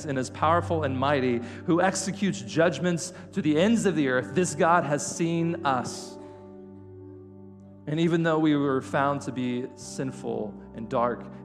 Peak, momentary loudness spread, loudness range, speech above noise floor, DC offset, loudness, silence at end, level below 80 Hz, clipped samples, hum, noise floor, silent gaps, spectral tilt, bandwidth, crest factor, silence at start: -8 dBFS; 19 LU; 4 LU; 21 dB; under 0.1%; -26 LUFS; 0 s; -62 dBFS; under 0.1%; 50 Hz at -55 dBFS; -47 dBFS; none; -5.5 dB/octave; 13 kHz; 18 dB; 0 s